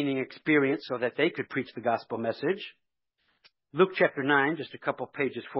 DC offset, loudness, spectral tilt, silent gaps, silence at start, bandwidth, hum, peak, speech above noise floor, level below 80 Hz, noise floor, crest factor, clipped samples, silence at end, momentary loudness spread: under 0.1%; -28 LUFS; -9.5 dB/octave; none; 0 s; 5.8 kHz; none; -8 dBFS; 48 dB; -78 dBFS; -76 dBFS; 20 dB; under 0.1%; 0 s; 10 LU